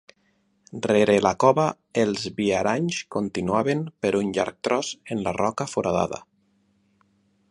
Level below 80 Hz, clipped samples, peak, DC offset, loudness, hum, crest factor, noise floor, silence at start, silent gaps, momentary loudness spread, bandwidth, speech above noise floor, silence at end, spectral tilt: -56 dBFS; under 0.1%; -4 dBFS; under 0.1%; -24 LUFS; none; 20 dB; -67 dBFS; 0.75 s; none; 9 LU; 11.5 kHz; 44 dB; 1.3 s; -5 dB/octave